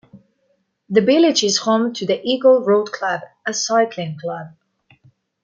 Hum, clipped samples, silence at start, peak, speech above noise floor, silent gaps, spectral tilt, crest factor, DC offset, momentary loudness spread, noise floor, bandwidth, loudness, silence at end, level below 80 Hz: none; under 0.1%; 0.15 s; -2 dBFS; 49 dB; none; -3.5 dB/octave; 16 dB; under 0.1%; 13 LU; -66 dBFS; 9.2 kHz; -18 LUFS; 0.95 s; -68 dBFS